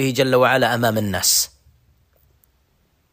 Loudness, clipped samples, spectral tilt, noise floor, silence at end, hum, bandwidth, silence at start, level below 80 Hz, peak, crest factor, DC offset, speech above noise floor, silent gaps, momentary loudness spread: -17 LUFS; under 0.1%; -3 dB/octave; -63 dBFS; 1.65 s; none; 15.5 kHz; 0 s; -54 dBFS; -4 dBFS; 18 dB; under 0.1%; 45 dB; none; 5 LU